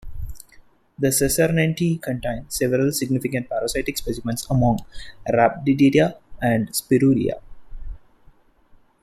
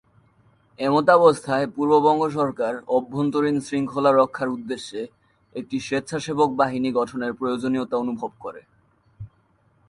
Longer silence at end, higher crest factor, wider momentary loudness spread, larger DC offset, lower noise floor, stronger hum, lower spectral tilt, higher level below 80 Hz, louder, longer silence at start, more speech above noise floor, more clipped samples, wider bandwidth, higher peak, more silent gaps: first, 1.05 s vs 0.6 s; about the same, 18 dB vs 20 dB; about the same, 15 LU vs 14 LU; neither; second, -53 dBFS vs -62 dBFS; neither; about the same, -5.5 dB/octave vs -6 dB/octave; first, -40 dBFS vs -62 dBFS; about the same, -21 LUFS vs -22 LUFS; second, 0.05 s vs 0.8 s; second, 33 dB vs 41 dB; neither; first, 15.5 kHz vs 11.5 kHz; about the same, -4 dBFS vs -2 dBFS; neither